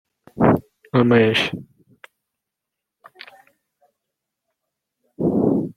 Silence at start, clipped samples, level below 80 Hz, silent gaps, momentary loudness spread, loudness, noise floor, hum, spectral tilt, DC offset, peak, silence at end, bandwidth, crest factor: 0.35 s; under 0.1%; -54 dBFS; none; 10 LU; -19 LUFS; -83 dBFS; none; -7 dB/octave; under 0.1%; -2 dBFS; 0.1 s; 13 kHz; 22 dB